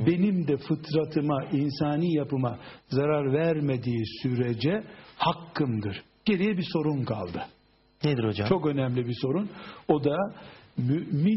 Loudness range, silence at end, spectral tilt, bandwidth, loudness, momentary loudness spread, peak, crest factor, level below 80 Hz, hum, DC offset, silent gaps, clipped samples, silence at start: 2 LU; 0 s; -6.5 dB/octave; 5.8 kHz; -28 LUFS; 8 LU; -8 dBFS; 20 dB; -60 dBFS; none; under 0.1%; none; under 0.1%; 0 s